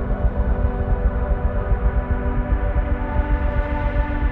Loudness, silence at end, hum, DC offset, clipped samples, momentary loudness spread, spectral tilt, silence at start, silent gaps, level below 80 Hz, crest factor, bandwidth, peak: -23 LUFS; 0 s; none; under 0.1%; under 0.1%; 1 LU; -10.5 dB/octave; 0 s; none; -20 dBFS; 12 dB; 3.9 kHz; -6 dBFS